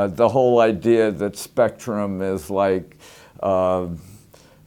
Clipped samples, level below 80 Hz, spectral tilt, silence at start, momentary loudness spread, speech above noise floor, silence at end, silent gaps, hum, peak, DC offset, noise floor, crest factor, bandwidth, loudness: under 0.1%; -54 dBFS; -6.5 dB/octave; 0 s; 10 LU; 30 dB; 0.5 s; none; none; -2 dBFS; under 0.1%; -49 dBFS; 18 dB; 17.5 kHz; -20 LUFS